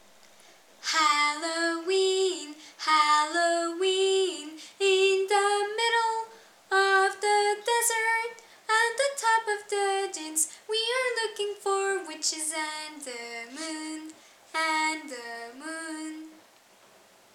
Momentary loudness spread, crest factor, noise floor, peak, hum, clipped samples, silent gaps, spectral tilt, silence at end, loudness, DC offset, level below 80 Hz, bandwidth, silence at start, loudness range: 15 LU; 18 dB; -58 dBFS; -10 dBFS; none; under 0.1%; none; 1 dB/octave; 1 s; -26 LUFS; under 0.1%; under -90 dBFS; 16 kHz; 0.8 s; 8 LU